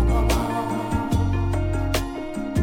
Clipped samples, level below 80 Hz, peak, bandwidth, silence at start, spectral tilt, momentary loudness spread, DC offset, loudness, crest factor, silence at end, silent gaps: under 0.1%; -26 dBFS; -8 dBFS; 17 kHz; 0 s; -6.5 dB/octave; 5 LU; under 0.1%; -24 LUFS; 14 dB; 0 s; none